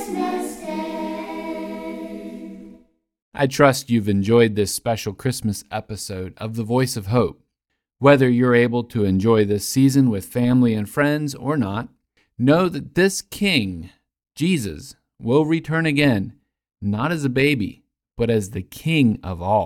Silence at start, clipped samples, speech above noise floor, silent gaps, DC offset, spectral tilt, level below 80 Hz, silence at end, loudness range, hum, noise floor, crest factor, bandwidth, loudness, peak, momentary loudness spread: 0 s; under 0.1%; 59 dB; 3.22-3.32 s; under 0.1%; -6 dB/octave; -50 dBFS; 0 s; 5 LU; none; -78 dBFS; 20 dB; 17 kHz; -20 LUFS; 0 dBFS; 14 LU